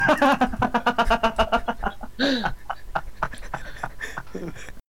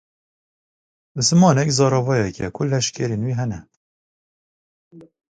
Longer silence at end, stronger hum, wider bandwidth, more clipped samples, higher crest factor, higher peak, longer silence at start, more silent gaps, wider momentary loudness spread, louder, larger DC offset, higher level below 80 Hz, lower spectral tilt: second, 0 s vs 0.35 s; neither; first, 17 kHz vs 9.4 kHz; neither; about the same, 16 dB vs 20 dB; second, -8 dBFS vs -2 dBFS; second, 0 s vs 1.15 s; second, none vs 3.77-4.91 s; first, 15 LU vs 12 LU; second, -24 LUFS vs -19 LUFS; first, 1% vs under 0.1%; first, -36 dBFS vs -52 dBFS; about the same, -5 dB/octave vs -5 dB/octave